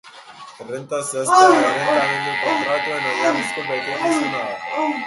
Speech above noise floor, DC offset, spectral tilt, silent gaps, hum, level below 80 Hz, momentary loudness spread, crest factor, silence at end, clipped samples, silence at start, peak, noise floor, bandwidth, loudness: 21 dB; under 0.1%; -3 dB/octave; none; none; -68 dBFS; 13 LU; 18 dB; 0 s; under 0.1%; 0.05 s; 0 dBFS; -40 dBFS; 12 kHz; -18 LUFS